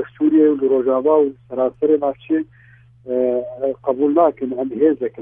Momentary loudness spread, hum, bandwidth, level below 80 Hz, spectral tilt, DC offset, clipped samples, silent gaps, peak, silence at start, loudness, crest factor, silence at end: 8 LU; none; 3.6 kHz; -60 dBFS; -11 dB/octave; under 0.1%; under 0.1%; none; -4 dBFS; 0 s; -18 LUFS; 14 dB; 0 s